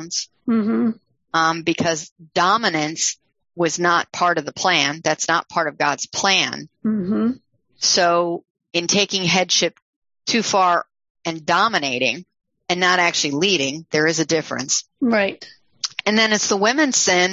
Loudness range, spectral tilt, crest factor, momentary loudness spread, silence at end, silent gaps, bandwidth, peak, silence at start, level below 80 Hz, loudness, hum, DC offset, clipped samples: 1 LU; -2.5 dB/octave; 18 dB; 10 LU; 0 s; 2.11-2.16 s, 8.50-8.55 s, 9.82-10.02 s, 11.10-11.15 s; 8 kHz; -2 dBFS; 0 s; -64 dBFS; -19 LUFS; none; under 0.1%; under 0.1%